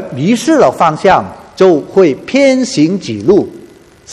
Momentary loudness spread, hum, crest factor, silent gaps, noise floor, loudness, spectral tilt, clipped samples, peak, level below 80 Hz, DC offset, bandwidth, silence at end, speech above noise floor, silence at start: 5 LU; none; 10 dB; none; -38 dBFS; -10 LUFS; -5.5 dB/octave; 0.3%; 0 dBFS; -46 dBFS; under 0.1%; 12.5 kHz; 0 s; 28 dB; 0 s